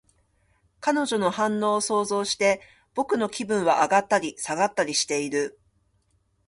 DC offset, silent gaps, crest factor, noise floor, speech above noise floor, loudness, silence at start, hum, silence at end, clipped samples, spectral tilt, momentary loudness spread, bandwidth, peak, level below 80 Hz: under 0.1%; none; 18 dB; -68 dBFS; 44 dB; -24 LUFS; 0.8 s; none; 0.95 s; under 0.1%; -3 dB/octave; 8 LU; 11.5 kHz; -8 dBFS; -66 dBFS